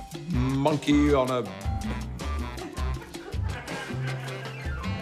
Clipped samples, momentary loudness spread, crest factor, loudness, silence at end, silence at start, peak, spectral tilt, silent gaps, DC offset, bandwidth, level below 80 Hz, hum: under 0.1%; 12 LU; 18 dB; -29 LUFS; 0 s; 0 s; -10 dBFS; -6.5 dB/octave; none; under 0.1%; 15 kHz; -36 dBFS; none